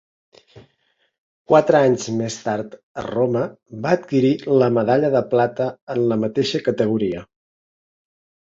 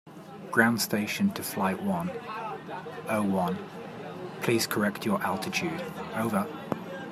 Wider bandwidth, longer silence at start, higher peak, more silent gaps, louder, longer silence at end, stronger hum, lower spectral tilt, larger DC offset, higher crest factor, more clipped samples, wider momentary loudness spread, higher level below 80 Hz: second, 7.8 kHz vs 15.5 kHz; first, 0.55 s vs 0.05 s; first, -2 dBFS vs -8 dBFS; first, 1.18-1.45 s, 2.83-2.95 s, 5.82-5.87 s vs none; first, -19 LUFS vs -29 LUFS; first, 1.25 s vs 0 s; neither; first, -6.5 dB/octave vs -4.5 dB/octave; neither; about the same, 18 dB vs 22 dB; neither; second, 11 LU vs 14 LU; first, -58 dBFS vs -70 dBFS